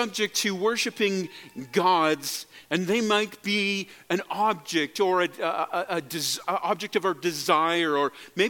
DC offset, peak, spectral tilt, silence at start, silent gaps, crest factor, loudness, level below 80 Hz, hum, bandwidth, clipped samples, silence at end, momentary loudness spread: under 0.1%; -6 dBFS; -3 dB/octave; 0 s; none; 20 dB; -26 LUFS; -76 dBFS; none; 17.5 kHz; under 0.1%; 0 s; 7 LU